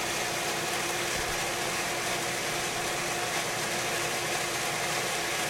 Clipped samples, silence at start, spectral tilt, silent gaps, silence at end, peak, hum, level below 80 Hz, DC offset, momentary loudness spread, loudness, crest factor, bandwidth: under 0.1%; 0 s; -1.5 dB/octave; none; 0 s; -16 dBFS; none; -56 dBFS; under 0.1%; 1 LU; -29 LUFS; 14 dB; 16 kHz